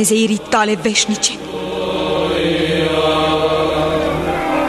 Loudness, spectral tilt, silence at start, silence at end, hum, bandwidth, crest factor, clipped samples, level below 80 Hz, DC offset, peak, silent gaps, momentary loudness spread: -16 LUFS; -3.5 dB/octave; 0 s; 0 s; none; 13 kHz; 16 dB; under 0.1%; -38 dBFS; under 0.1%; 0 dBFS; none; 5 LU